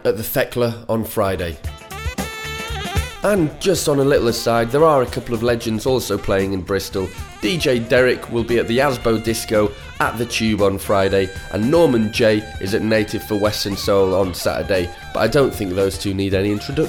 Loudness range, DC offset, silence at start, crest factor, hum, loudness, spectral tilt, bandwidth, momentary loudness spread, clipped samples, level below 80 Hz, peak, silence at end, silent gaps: 3 LU; under 0.1%; 0 s; 16 dB; none; -19 LUFS; -5 dB/octave; 18 kHz; 9 LU; under 0.1%; -36 dBFS; -2 dBFS; 0 s; none